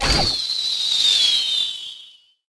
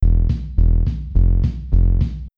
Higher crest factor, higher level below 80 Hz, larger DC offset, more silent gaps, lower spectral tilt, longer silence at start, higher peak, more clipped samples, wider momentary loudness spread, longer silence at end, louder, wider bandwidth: first, 16 dB vs 10 dB; second, -36 dBFS vs -16 dBFS; neither; neither; second, -1.5 dB/octave vs -10.5 dB/octave; about the same, 0 s vs 0 s; about the same, -4 dBFS vs -4 dBFS; neither; first, 11 LU vs 4 LU; first, 0.4 s vs 0.1 s; about the same, -17 LUFS vs -19 LUFS; first, 11 kHz vs 1.4 kHz